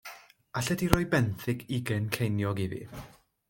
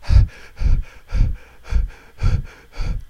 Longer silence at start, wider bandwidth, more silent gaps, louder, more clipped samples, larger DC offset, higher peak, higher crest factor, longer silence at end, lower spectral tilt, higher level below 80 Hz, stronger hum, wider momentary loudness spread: about the same, 0.05 s vs 0 s; first, 17 kHz vs 7 kHz; neither; second, -30 LUFS vs -24 LUFS; neither; neither; about the same, -2 dBFS vs -2 dBFS; first, 28 dB vs 16 dB; first, 0.4 s vs 0.05 s; second, -5.5 dB/octave vs -7 dB/octave; second, -48 dBFS vs -20 dBFS; neither; first, 16 LU vs 13 LU